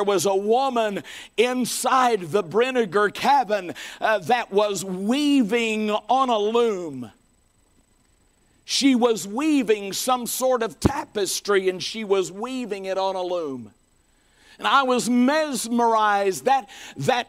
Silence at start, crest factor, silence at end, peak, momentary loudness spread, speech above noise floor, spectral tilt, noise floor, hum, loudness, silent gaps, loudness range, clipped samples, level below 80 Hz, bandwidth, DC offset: 0 s; 22 dB; 0.05 s; 0 dBFS; 9 LU; 40 dB; -3.5 dB/octave; -62 dBFS; none; -22 LUFS; none; 3 LU; under 0.1%; -52 dBFS; 16 kHz; under 0.1%